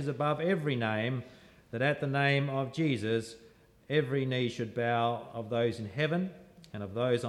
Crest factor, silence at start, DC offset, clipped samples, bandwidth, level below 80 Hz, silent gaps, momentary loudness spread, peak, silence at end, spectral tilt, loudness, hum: 16 dB; 0 s; under 0.1%; under 0.1%; 12 kHz; -70 dBFS; none; 10 LU; -16 dBFS; 0 s; -6.5 dB/octave; -32 LUFS; none